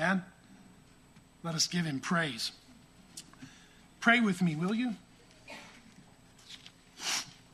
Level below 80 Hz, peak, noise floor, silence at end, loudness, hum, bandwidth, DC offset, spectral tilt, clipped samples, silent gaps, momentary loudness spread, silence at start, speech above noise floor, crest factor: -68 dBFS; -10 dBFS; -59 dBFS; 0.2 s; -31 LUFS; none; 13.5 kHz; under 0.1%; -4 dB/octave; under 0.1%; none; 25 LU; 0 s; 29 dB; 26 dB